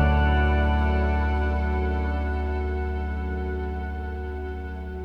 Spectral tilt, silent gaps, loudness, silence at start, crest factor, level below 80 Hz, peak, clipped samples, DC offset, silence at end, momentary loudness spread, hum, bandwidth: -9 dB/octave; none; -26 LUFS; 0 s; 16 dB; -26 dBFS; -8 dBFS; under 0.1%; under 0.1%; 0 s; 11 LU; none; 4.7 kHz